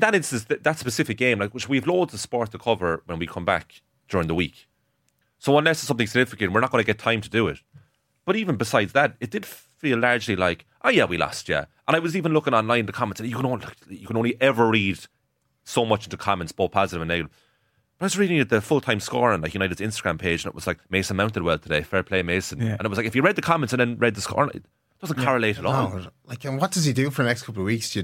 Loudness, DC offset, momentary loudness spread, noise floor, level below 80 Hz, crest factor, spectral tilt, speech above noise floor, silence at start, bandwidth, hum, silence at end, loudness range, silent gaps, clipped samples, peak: -23 LUFS; under 0.1%; 9 LU; -72 dBFS; -52 dBFS; 20 dB; -5 dB/octave; 48 dB; 0 s; 16.5 kHz; none; 0 s; 2 LU; none; under 0.1%; -4 dBFS